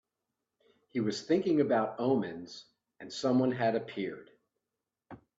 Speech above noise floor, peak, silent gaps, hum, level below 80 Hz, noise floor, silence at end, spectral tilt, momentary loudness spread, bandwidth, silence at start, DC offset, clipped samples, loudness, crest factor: 58 dB; -16 dBFS; none; none; -76 dBFS; -89 dBFS; 0.25 s; -6 dB/octave; 19 LU; 7.8 kHz; 0.95 s; under 0.1%; under 0.1%; -31 LUFS; 18 dB